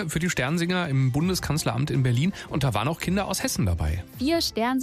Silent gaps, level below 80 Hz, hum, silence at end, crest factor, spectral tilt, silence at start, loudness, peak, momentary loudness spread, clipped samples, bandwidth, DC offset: none; -42 dBFS; none; 0 s; 14 dB; -5 dB/octave; 0 s; -25 LUFS; -12 dBFS; 3 LU; under 0.1%; 15.5 kHz; under 0.1%